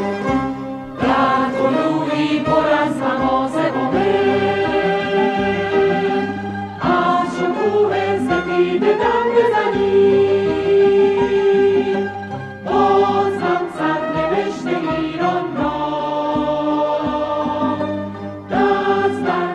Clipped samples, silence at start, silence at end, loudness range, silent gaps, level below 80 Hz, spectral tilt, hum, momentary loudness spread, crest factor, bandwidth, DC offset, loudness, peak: under 0.1%; 0 s; 0 s; 5 LU; none; -46 dBFS; -6.5 dB/octave; none; 7 LU; 14 dB; 9.2 kHz; under 0.1%; -17 LUFS; -4 dBFS